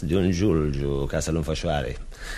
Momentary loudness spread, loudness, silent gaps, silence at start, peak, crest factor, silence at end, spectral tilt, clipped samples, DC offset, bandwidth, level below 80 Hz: 7 LU; -25 LUFS; none; 0 s; -10 dBFS; 14 dB; 0 s; -6 dB/octave; under 0.1%; under 0.1%; 13.5 kHz; -34 dBFS